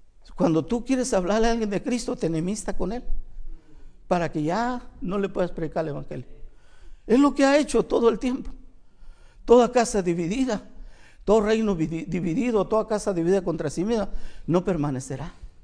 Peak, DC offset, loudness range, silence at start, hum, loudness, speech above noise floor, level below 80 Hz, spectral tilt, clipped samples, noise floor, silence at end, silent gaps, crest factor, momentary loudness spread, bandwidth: -4 dBFS; under 0.1%; 6 LU; 0.2 s; none; -24 LUFS; 21 dB; -38 dBFS; -6 dB/octave; under 0.1%; -44 dBFS; 0.15 s; none; 20 dB; 15 LU; 10.5 kHz